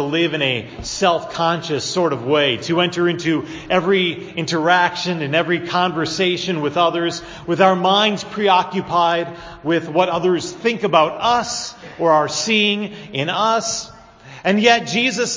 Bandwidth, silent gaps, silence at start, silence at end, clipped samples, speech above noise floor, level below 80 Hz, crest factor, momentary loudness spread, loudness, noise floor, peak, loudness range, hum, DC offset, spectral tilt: 7.6 kHz; none; 0 s; 0 s; under 0.1%; 22 dB; -52 dBFS; 18 dB; 9 LU; -18 LUFS; -41 dBFS; 0 dBFS; 1 LU; none; under 0.1%; -4 dB/octave